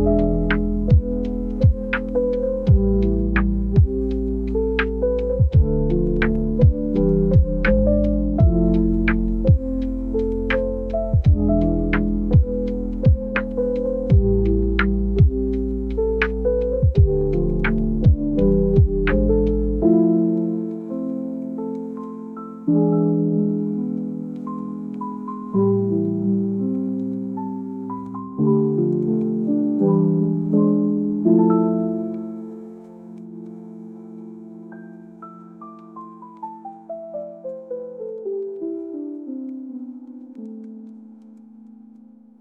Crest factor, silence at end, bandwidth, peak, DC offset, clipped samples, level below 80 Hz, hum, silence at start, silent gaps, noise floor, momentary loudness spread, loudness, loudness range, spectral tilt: 16 dB; 1 s; 5.2 kHz; -4 dBFS; under 0.1%; under 0.1%; -26 dBFS; none; 0 s; none; -46 dBFS; 19 LU; -20 LUFS; 16 LU; -11 dB/octave